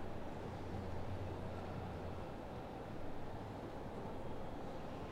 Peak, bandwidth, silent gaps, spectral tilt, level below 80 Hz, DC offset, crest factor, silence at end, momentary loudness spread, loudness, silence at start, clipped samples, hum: -32 dBFS; 12 kHz; none; -7.5 dB/octave; -54 dBFS; under 0.1%; 12 dB; 0 s; 3 LU; -48 LUFS; 0 s; under 0.1%; none